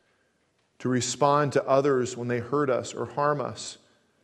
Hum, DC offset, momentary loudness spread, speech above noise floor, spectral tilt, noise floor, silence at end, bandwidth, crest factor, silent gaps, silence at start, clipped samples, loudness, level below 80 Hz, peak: none; under 0.1%; 11 LU; 45 dB; -5 dB/octave; -70 dBFS; 0.5 s; 12 kHz; 20 dB; none; 0.8 s; under 0.1%; -26 LUFS; -70 dBFS; -8 dBFS